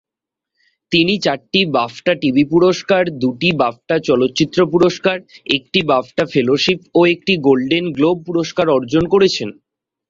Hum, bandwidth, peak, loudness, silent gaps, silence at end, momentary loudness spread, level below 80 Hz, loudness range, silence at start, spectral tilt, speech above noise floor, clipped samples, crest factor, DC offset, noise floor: none; 7.6 kHz; 0 dBFS; -15 LUFS; none; 0.6 s; 5 LU; -52 dBFS; 1 LU; 0.9 s; -5.5 dB/octave; 69 dB; under 0.1%; 16 dB; under 0.1%; -85 dBFS